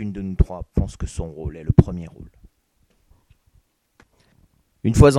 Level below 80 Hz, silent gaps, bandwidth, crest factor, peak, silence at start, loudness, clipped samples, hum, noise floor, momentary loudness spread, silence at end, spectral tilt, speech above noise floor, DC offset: -28 dBFS; none; 13 kHz; 22 dB; 0 dBFS; 0 s; -22 LUFS; under 0.1%; none; -64 dBFS; 14 LU; 0 s; -7.5 dB/octave; 46 dB; under 0.1%